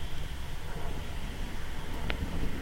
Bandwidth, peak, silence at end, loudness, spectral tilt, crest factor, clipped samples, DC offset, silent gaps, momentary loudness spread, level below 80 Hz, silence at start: 16 kHz; -10 dBFS; 0 s; -39 LUFS; -5 dB/octave; 22 dB; under 0.1%; under 0.1%; none; 5 LU; -36 dBFS; 0 s